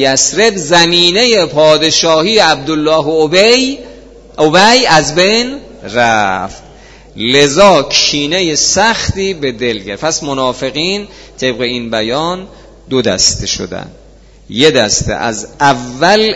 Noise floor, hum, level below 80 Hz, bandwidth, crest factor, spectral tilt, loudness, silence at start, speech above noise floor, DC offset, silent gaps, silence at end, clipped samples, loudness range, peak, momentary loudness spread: -37 dBFS; none; -36 dBFS; 11 kHz; 12 dB; -2.5 dB/octave; -10 LUFS; 0 s; 26 dB; under 0.1%; none; 0 s; 0.5%; 7 LU; 0 dBFS; 11 LU